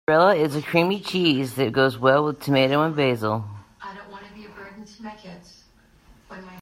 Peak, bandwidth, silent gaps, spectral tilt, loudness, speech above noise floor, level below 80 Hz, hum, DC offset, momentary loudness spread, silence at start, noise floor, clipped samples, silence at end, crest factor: -4 dBFS; 16 kHz; none; -6 dB/octave; -21 LUFS; 35 dB; -60 dBFS; none; under 0.1%; 23 LU; 0.1 s; -56 dBFS; under 0.1%; 0 s; 18 dB